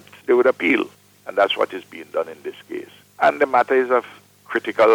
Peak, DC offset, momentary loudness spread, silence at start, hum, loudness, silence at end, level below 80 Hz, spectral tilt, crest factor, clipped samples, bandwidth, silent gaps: -4 dBFS; under 0.1%; 17 LU; 0.3 s; 50 Hz at -60 dBFS; -20 LUFS; 0 s; -66 dBFS; -4.5 dB/octave; 16 dB; under 0.1%; 17.5 kHz; none